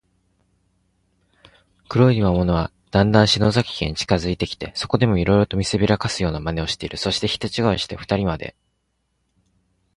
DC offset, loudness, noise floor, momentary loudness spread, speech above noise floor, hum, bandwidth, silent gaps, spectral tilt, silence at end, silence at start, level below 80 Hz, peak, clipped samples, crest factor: under 0.1%; -20 LUFS; -71 dBFS; 9 LU; 51 dB; none; 11.5 kHz; none; -5.5 dB/octave; 1.45 s; 1.9 s; -38 dBFS; -2 dBFS; under 0.1%; 20 dB